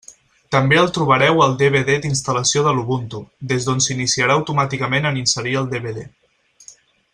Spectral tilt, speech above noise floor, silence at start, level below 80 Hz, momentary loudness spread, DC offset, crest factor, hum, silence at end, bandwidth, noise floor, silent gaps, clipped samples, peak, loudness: -4 dB/octave; 30 dB; 0.1 s; -52 dBFS; 10 LU; under 0.1%; 18 dB; none; 0.45 s; 11 kHz; -47 dBFS; none; under 0.1%; -2 dBFS; -17 LUFS